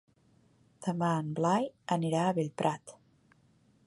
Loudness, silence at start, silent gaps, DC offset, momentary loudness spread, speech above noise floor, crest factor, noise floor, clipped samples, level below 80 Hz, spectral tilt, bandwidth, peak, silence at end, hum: -32 LUFS; 0.8 s; none; under 0.1%; 9 LU; 36 dB; 22 dB; -66 dBFS; under 0.1%; -76 dBFS; -6.5 dB/octave; 11.5 kHz; -12 dBFS; 0.95 s; none